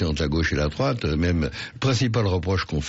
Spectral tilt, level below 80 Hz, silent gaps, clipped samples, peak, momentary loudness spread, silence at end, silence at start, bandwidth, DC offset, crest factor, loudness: -5.5 dB/octave; -34 dBFS; none; under 0.1%; -12 dBFS; 4 LU; 0 s; 0 s; 8 kHz; under 0.1%; 12 dB; -24 LUFS